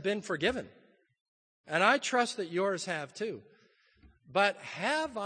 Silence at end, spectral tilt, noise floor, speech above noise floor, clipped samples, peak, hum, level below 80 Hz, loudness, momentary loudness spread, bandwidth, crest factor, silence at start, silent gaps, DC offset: 0 s; -3.5 dB/octave; -66 dBFS; 35 dB; under 0.1%; -10 dBFS; none; -66 dBFS; -31 LUFS; 13 LU; 9.8 kHz; 24 dB; 0 s; 1.21-1.64 s; under 0.1%